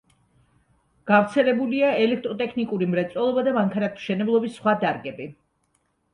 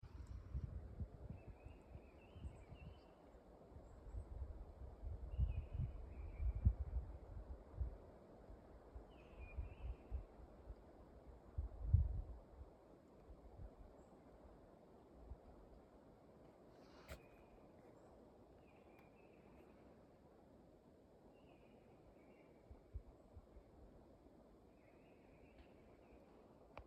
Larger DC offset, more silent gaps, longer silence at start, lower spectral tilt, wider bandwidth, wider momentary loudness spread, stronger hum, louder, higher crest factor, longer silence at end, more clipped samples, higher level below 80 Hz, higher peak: neither; neither; first, 1.05 s vs 0 s; second, -7 dB/octave vs -9 dB/octave; first, 10.5 kHz vs 8.4 kHz; second, 9 LU vs 19 LU; neither; first, -23 LUFS vs -51 LUFS; second, 20 dB vs 28 dB; first, 0.8 s vs 0 s; neither; second, -66 dBFS vs -54 dBFS; first, -4 dBFS vs -22 dBFS